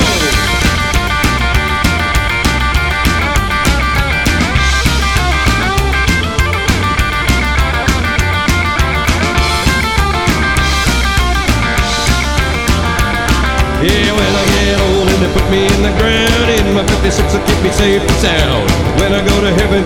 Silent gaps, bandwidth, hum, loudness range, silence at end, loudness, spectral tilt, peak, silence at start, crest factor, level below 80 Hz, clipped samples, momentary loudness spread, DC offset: none; 17.5 kHz; none; 1 LU; 0 s; -12 LUFS; -4.5 dB/octave; 0 dBFS; 0 s; 12 dB; -16 dBFS; under 0.1%; 2 LU; under 0.1%